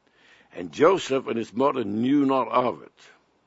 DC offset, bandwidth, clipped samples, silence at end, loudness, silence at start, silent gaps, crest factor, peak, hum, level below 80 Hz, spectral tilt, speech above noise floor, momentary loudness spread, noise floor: under 0.1%; 8 kHz; under 0.1%; 0.6 s; -23 LUFS; 0.55 s; none; 20 dB; -4 dBFS; none; -72 dBFS; -6 dB/octave; 34 dB; 17 LU; -58 dBFS